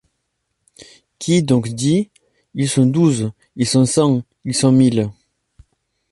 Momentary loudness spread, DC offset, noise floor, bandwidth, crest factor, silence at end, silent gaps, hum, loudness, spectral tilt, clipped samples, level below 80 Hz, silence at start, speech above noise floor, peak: 12 LU; under 0.1%; -73 dBFS; 11.5 kHz; 16 dB; 1 s; none; none; -17 LUFS; -6 dB/octave; under 0.1%; -54 dBFS; 1.2 s; 57 dB; -2 dBFS